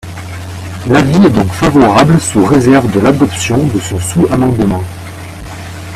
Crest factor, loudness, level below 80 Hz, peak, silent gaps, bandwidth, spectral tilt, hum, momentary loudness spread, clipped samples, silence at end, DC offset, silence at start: 10 dB; -10 LUFS; -34 dBFS; 0 dBFS; none; 15 kHz; -6 dB/octave; none; 18 LU; 0.2%; 0 s; under 0.1%; 0.05 s